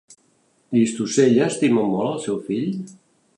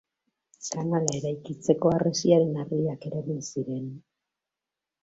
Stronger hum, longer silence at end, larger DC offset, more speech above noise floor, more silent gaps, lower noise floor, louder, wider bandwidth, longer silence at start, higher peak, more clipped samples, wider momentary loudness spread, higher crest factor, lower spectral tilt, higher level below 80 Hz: neither; second, 0.45 s vs 1.05 s; neither; second, 43 dB vs 62 dB; neither; second, -62 dBFS vs -88 dBFS; first, -20 LUFS vs -27 LUFS; first, 11 kHz vs 8.2 kHz; about the same, 0.7 s vs 0.6 s; about the same, -4 dBFS vs -6 dBFS; neither; about the same, 10 LU vs 12 LU; second, 16 dB vs 22 dB; about the same, -5.5 dB/octave vs -6 dB/octave; about the same, -68 dBFS vs -64 dBFS